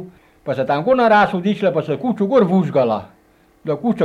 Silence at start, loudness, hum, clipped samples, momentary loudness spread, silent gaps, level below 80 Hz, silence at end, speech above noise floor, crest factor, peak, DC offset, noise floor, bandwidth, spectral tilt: 0 s; -17 LUFS; none; under 0.1%; 12 LU; none; -56 dBFS; 0 s; 38 dB; 14 dB; -4 dBFS; under 0.1%; -54 dBFS; 9.2 kHz; -8 dB/octave